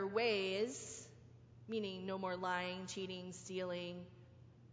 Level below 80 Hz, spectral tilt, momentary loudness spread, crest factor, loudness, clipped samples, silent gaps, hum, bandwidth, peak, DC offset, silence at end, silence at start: -74 dBFS; -4 dB/octave; 25 LU; 20 dB; -42 LUFS; under 0.1%; none; none; 8 kHz; -24 dBFS; under 0.1%; 0 s; 0 s